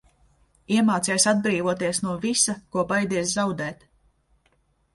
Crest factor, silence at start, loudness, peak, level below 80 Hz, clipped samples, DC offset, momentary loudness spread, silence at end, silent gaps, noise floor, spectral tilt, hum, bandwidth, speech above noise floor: 18 dB; 0.7 s; -23 LUFS; -6 dBFS; -60 dBFS; under 0.1%; under 0.1%; 7 LU; 1.2 s; none; -66 dBFS; -3.5 dB/octave; none; 11.5 kHz; 43 dB